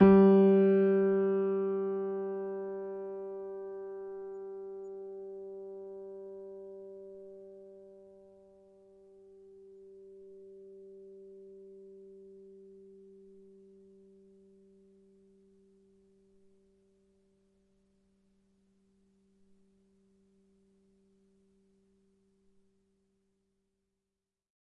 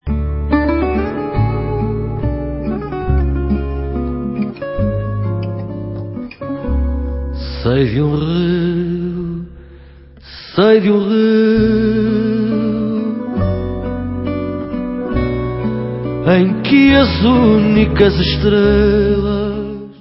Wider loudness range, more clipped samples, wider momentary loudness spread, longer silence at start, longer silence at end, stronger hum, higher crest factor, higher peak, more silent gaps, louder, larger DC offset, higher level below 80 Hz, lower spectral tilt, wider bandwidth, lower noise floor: first, 24 LU vs 8 LU; neither; first, 29 LU vs 12 LU; about the same, 0 s vs 0.05 s; first, 12.5 s vs 0.05 s; neither; first, 24 dB vs 14 dB; second, -10 dBFS vs 0 dBFS; neither; second, -30 LUFS vs -16 LUFS; neither; second, -68 dBFS vs -26 dBFS; about the same, -11 dB/octave vs -11 dB/octave; second, 3.6 kHz vs 5.8 kHz; first, -90 dBFS vs -39 dBFS